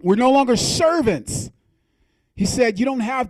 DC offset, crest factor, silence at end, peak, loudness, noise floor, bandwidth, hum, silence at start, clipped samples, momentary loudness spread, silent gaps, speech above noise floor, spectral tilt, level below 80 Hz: under 0.1%; 14 dB; 0 s; -4 dBFS; -18 LUFS; -65 dBFS; 14.5 kHz; none; 0.05 s; under 0.1%; 12 LU; none; 47 dB; -4.5 dB/octave; -44 dBFS